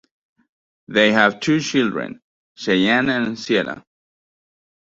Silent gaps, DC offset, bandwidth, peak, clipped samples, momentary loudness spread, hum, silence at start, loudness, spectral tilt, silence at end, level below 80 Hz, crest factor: 2.24-2.55 s; under 0.1%; 7.8 kHz; 0 dBFS; under 0.1%; 14 LU; none; 0.9 s; -18 LUFS; -4.5 dB/octave; 1.05 s; -60 dBFS; 20 dB